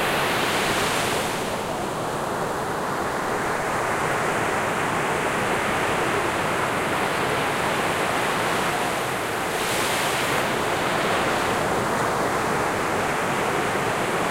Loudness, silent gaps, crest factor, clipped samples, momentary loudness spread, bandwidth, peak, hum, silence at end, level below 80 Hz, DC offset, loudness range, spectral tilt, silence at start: -23 LUFS; none; 14 dB; under 0.1%; 4 LU; 16 kHz; -10 dBFS; none; 0 s; -48 dBFS; under 0.1%; 2 LU; -3.5 dB/octave; 0 s